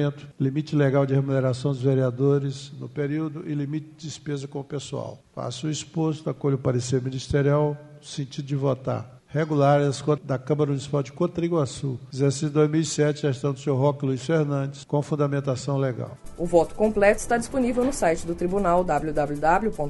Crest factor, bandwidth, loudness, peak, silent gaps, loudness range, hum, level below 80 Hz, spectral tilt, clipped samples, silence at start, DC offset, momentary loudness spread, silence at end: 20 dB; 11.5 kHz; -25 LUFS; -4 dBFS; none; 5 LU; none; -46 dBFS; -6.5 dB/octave; under 0.1%; 0 s; under 0.1%; 11 LU; 0 s